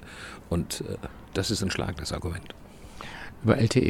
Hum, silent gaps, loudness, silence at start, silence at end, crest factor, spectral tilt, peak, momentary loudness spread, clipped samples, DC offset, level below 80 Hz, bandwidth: none; none; -30 LUFS; 0 s; 0 s; 24 dB; -5.5 dB/octave; -4 dBFS; 17 LU; under 0.1%; under 0.1%; -46 dBFS; 16 kHz